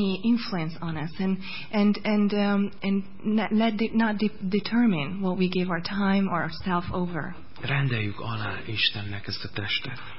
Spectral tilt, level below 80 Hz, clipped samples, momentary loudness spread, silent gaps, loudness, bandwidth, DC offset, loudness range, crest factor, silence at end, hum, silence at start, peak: -10 dB/octave; -52 dBFS; under 0.1%; 9 LU; none; -27 LUFS; 5.8 kHz; 2%; 3 LU; 16 dB; 0 s; none; 0 s; -10 dBFS